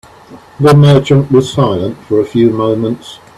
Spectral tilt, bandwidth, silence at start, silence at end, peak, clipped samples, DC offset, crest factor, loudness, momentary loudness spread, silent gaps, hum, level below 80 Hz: -7.5 dB/octave; 11.5 kHz; 0.3 s; 0.25 s; 0 dBFS; under 0.1%; under 0.1%; 10 dB; -10 LUFS; 10 LU; none; none; -44 dBFS